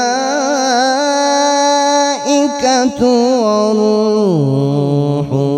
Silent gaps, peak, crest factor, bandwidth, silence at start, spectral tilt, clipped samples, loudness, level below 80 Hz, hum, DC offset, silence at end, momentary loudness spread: none; 0 dBFS; 12 dB; 13 kHz; 0 s; -4.5 dB/octave; under 0.1%; -13 LUFS; -54 dBFS; none; under 0.1%; 0 s; 3 LU